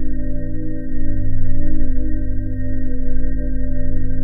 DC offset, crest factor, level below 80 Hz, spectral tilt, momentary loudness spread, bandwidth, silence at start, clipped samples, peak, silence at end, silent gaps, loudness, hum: 1%; 10 dB; -18 dBFS; -13 dB/octave; 3 LU; 2 kHz; 0 s; under 0.1%; -2 dBFS; 0 s; none; -25 LUFS; none